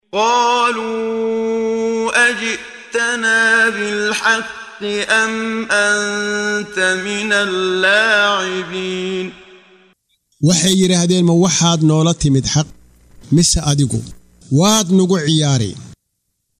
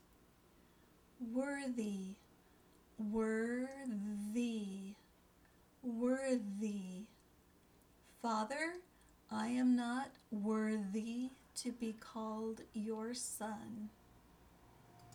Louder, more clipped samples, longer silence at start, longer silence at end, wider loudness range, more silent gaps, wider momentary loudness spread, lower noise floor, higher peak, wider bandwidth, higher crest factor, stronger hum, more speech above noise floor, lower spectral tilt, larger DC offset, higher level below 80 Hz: first, -15 LUFS vs -41 LUFS; neither; second, 0.15 s vs 1.2 s; first, 0.65 s vs 0 s; second, 2 LU vs 5 LU; neither; second, 9 LU vs 13 LU; about the same, -71 dBFS vs -69 dBFS; first, -2 dBFS vs -26 dBFS; second, 15.5 kHz vs 19.5 kHz; about the same, 14 dB vs 16 dB; neither; first, 56 dB vs 28 dB; about the same, -4 dB/octave vs -5 dB/octave; neither; first, -40 dBFS vs -74 dBFS